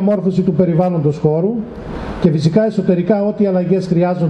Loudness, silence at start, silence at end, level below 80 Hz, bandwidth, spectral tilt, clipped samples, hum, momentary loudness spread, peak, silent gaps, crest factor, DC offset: -15 LUFS; 0 s; 0 s; -40 dBFS; 8.6 kHz; -9 dB/octave; under 0.1%; none; 6 LU; 0 dBFS; none; 14 dB; under 0.1%